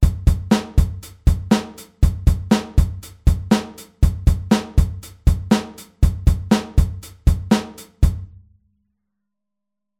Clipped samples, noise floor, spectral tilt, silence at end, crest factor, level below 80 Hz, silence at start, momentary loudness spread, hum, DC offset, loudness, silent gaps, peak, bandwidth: under 0.1%; -83 dBFS; -6.5 dB/octave; 1.75 s; 18 dB; -22 dBFS; 0 s; 8 LU; none; under 0.1%; -20 LUFS; none; -2 dBFS; 15.5 kHz